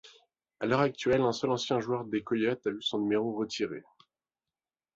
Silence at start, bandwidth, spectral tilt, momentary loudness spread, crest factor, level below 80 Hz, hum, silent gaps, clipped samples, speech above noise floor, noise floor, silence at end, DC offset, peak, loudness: 0.05 s; 8 kHz; -5.5 dB/octave; 7 LU; 20 dB; -66 dBFS; none; none; under 0.1%; over 60 dB; under -90 dBFS; 1.15 s; under 0.1%; -12 dBFS; -30 LUFS